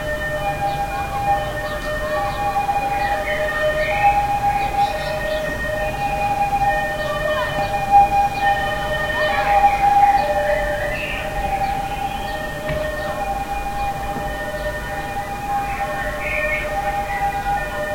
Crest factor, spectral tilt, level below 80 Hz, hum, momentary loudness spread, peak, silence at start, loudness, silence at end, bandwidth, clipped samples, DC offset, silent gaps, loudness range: 18 dB; -4.5 dB/octave; -34 dBFS; none; 9 LU; -2 dBFS; 0 s; -20 LUFS; 0 s; 16.5 kHz; under 0.1%; under 0.1%; none; 8 LU